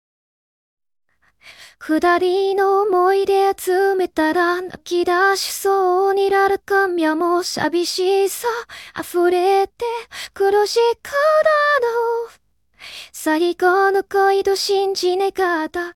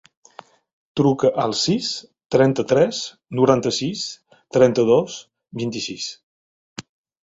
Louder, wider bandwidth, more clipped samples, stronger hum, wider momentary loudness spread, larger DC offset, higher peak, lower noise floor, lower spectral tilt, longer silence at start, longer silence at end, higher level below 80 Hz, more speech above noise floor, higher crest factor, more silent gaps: about the same, -18 LUFS vs -20 LUFS; first, 17 kHz vs 8 kHz; neither; neither; second, 10 LU vs 19 LU; neither; about the same, -4 dBFS vs -2 dBFS; about the same, -49 dBFS vs -46 dBFS; second, -2.5 dB/octave vs -5 dB/octave; first, 1.45 s vs 0.95 s; second, 0.05 s vs 0.4 s; about the same, -58 dBFS vs -58 dBFS; first, 31 dB vs 27 dB; second, 14 dB vs 20 dB; second, none vs 6.23-6.76 s